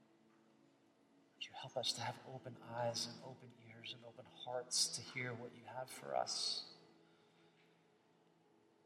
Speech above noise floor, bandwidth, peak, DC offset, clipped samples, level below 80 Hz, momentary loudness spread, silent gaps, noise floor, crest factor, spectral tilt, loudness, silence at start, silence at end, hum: 28 dB; 15.5 kHz; -24 dBFS; under 0.1%; under 0.1%; under -90 dBFS; 17 LU; none; -73 dBFS; 24 dB; -2 dB/octave; -43 LUFS; 1.4 s; 1.35 s; none